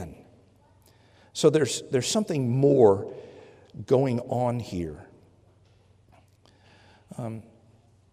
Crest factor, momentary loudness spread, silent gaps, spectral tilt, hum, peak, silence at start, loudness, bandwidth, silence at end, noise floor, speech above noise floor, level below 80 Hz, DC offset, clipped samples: 22 dB; 24 LU; none; -5.5 dB/octave; none; -6 dBFS; 0 s; -25 LUFS; 15.5 kHz; 0.7 s; -59 dBFS; 36 dB; -62 dBFS; under 0.1%; under 0.1%